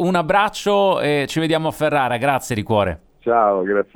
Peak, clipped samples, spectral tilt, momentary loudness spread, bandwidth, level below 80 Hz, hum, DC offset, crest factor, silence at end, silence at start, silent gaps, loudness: -2 dBFS; under 0.1%; -5.5 dB/octave; 4 LU; 18.5 kHz; -48 dBFS; none; under 0.1%; 16 dB; 0.1 s; 0 s; none; -18 LUFS